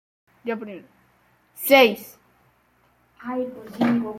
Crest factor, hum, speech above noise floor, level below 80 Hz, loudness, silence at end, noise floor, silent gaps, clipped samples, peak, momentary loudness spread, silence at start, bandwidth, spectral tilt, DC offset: 22 dB; none; 41 dB; -66 dBFS; -21 LUFS; 0 s; -62 dBFS; none; under 0.1%; -2 dBFS; 23 LU; 0.45 s; 16.5 kHz; -4 dB/octave; under 0.1%